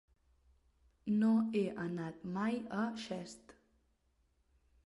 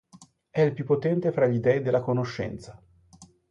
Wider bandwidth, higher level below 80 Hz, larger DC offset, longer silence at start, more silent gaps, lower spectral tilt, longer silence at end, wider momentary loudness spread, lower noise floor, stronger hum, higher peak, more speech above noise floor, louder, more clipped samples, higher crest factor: first, 11.5 kHz vs 10 kHz; second, -72 dBFS vs -60 dBFS; neither; first, 1.05 s vs 0.15 s; neither; about the same, -7 dB/octave vs -8 dB/octave; first, 1.5 s vs 0.25 s; first, 15 LU vs 11 LU; first, -76 dBFS vs -55 dBFS; neither; second, -24 dBFS vs -10 dBFS; first, 40 dB vs 30 dB; second, -37 LUFS vs -26 LUFS; neither; about the same, 16 dB vs 18 dB